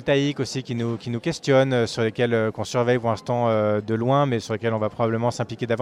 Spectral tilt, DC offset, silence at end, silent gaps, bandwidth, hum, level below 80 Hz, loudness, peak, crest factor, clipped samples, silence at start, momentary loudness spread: -6 dB/octave; under 0.1%; 0 s; none; 11.5 kHz; none; -58 dBFS; -23 LUFS; -6 dBFS; 16 dB; under 0.1%; 0 s; 7 LU